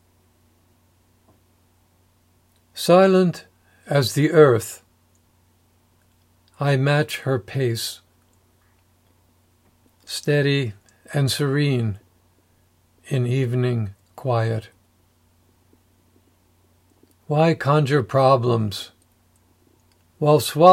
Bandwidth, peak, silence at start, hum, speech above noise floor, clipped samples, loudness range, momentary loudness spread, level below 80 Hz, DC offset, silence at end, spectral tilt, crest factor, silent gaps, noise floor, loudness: 16 kHz; 0 dBFS; 2.75 s; none; 42 dB; under 0.1%; 8 LU; 16 LU; -66 dBFS; under 0.1%; 0 s; -6 dB/octave; 22 dB; none; -60 dBFS; -20 LUFS